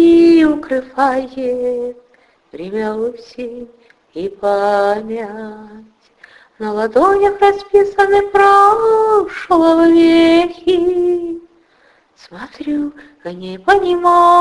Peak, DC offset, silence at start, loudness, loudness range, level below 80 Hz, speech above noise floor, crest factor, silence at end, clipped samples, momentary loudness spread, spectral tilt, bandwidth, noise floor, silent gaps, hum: 0 dBFS; under 0.1%; 0 s; -13 LUFS; 10 LU; -48 dBFS; 39 dB; 14 dB; 0 s; under 0.1%; 19 LU; -5.5 dB/octave; 11 kHz; -53 dBFS; none; none